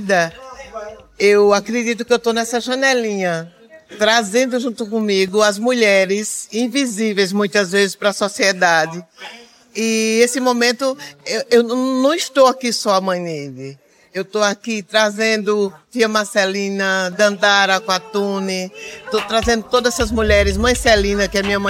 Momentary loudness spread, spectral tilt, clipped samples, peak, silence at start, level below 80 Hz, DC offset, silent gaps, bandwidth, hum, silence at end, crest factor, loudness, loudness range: 13 LU; -3.5 dB/octave; under 0.1%; -2 dBFS; 0 s; -36 dBFS; under 0.1%; none; 16.5 kHz; none; 0 s; 16 dB; -16 LUFS; 2 LU